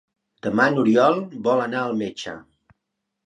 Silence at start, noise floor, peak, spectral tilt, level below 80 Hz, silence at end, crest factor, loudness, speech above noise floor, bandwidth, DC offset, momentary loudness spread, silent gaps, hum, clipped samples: 0.45 s; -79 dBFS; -4 dBFS; -6 dB/octave; -64 dBFS; 0.85 s; 20 dB; -21 LUFS; 59 dB; 9.4 kHz; under 0.1%; 16 LU; none; none; under 0.1%